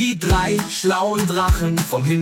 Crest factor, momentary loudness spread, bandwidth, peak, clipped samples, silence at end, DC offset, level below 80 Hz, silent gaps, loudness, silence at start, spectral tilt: 14 dB; 2 LU; 17 kHz; -4 dBFS; under 0.1%; 0 s; under 0.1%; -28 dBFS; none; -19 LUFS; 0 s; -5 dB/octave